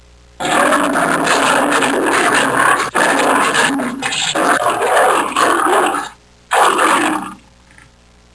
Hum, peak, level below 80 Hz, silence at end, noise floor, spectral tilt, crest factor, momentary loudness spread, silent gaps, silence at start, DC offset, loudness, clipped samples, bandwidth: none; 0 dBFS; -50 dBFS; 1 s; -47 dBFS; -2 dB/octave; 14 dB; 6 LU; none; 0.4 s; under 0.1%; -13 LUFS; under 0.1%; 11 kHz